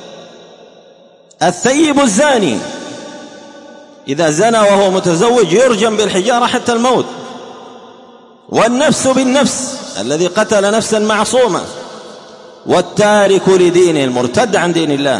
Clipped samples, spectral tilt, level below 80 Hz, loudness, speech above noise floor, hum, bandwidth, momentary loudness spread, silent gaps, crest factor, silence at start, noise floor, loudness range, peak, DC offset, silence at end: under 0.1%; -4 dB/octave; -54 dBFS; -12 LUFS; 32 dB; none; 11.5 kHz; 19 LU; none; 12 dB; 0 s; -43 dBFS; 3 LU; 0 dBFS; under 0.1%; 0 s